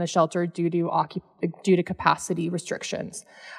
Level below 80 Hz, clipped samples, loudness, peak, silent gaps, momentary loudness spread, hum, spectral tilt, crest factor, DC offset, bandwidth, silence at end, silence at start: -62 dBFS; under 0.1%; -26 LUFS; -4 dBFS; none; 9 LU; none; -5.5 dB/octave; 22 dB; under 0.1%; 12.5 kHz; 0 s; 0 s